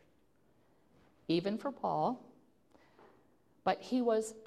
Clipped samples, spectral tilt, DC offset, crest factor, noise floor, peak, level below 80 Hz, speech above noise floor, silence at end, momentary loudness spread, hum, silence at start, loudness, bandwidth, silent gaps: under 0.1%; -5.5 dB/octave; under 0.1%; 20 dB; -71 dBFS; -18 dBFS; -76 dBFS; 37 dB; 0 s; 6 LU; none; 1.3 s; -35 LUFS; 13.5 kHz; none